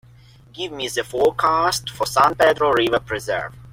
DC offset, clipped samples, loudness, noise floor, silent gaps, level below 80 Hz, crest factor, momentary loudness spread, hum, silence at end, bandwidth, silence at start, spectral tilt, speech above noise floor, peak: under 0.1%; under 0.1%; -19 LUFS; -48 dBFS; none; -48 dBFS; 18 dB; 11 LU; none; 0.05 s; 16.5 kHz; 0.55 s; -3.5 dB/octave; 28 dB; -2 dBFS